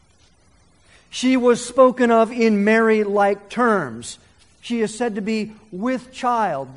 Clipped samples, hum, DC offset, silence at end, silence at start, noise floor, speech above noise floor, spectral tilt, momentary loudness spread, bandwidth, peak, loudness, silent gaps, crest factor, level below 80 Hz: under 0.1%; none; under 0.1%; 0 s; 1.15 s; -56 dBFS; 38 dB; -5 dB/octave; 14 LU; 11 kHz; -2 dBFS; -19 LUFS; none; 18 dB; -58 dBFS